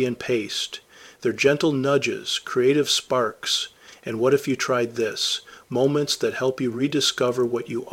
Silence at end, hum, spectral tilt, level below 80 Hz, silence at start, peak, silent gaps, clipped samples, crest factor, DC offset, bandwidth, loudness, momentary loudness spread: 0 s; none; -3.5 dB/octave; -66 dBFS; 0 s; -4 dBFS; none; under 0.1%; 20 dB; under 0.1%; 16.5 kHz; -23 LUFS; 8 LU